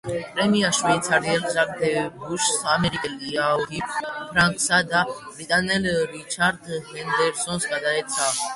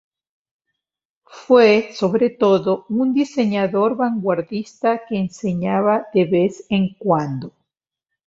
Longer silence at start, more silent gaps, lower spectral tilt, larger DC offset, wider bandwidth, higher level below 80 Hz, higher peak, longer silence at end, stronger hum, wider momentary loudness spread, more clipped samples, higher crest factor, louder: second, 0.05 s vs 1.35 s; neither; second, -3 dB/octave vs -7 dB/octave; neither; first, 12 kHz vs 7.8 kHz; first, -54 dBFS vs -60 dBFS; about the same, -4 dBFS vs -2 dBFS; second, 0 s vs 0.8 s; neither; about the same, 9 LU vs 8 LU; neither; about the same, 18 dB vs 18 dB; second, -22 LUFS vs -18 LUFS